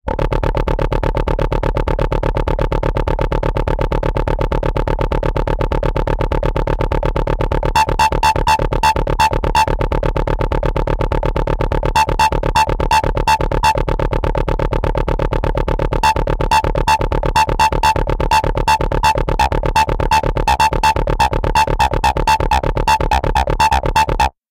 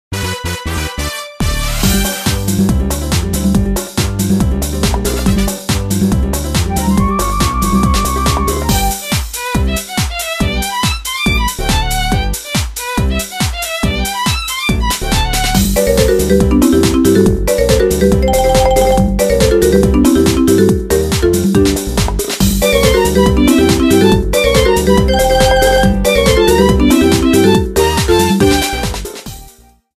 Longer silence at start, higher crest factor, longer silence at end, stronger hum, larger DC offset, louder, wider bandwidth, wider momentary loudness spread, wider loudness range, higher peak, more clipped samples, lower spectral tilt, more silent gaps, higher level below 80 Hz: about the same, 0.05 s vs 0.1 s; about the same, 14 dB vs 12 dB; second, 0.2 s vs 0.55 s; neither; neither; second, -16 LUFS vs -12 LUFS; about the same, 16 kHz vs 16 kHz; about the same, 5 LU vs 7 LU; about the same, 4 LU vs 5 LU; about the same, -2 dBFS vs 0 dBFS; neither; about the same, -5 dB/octave vs -5 dB/octave; neither; about the same, -20 dBFS vs -20 dBFS